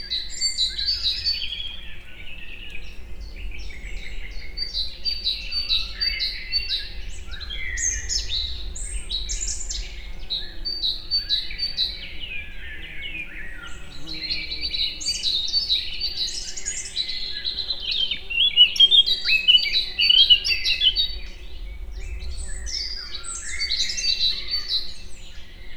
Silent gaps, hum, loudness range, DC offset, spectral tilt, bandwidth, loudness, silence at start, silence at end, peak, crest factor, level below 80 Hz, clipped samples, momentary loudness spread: none; none; 13 LU; under 0.1%; 0.5 dB/octave; 15 kHz; -21 LUFS; 0 s; 0 s; -4 dBFS; 20 dB; -36 dBFS; under 0.1%; 23 LU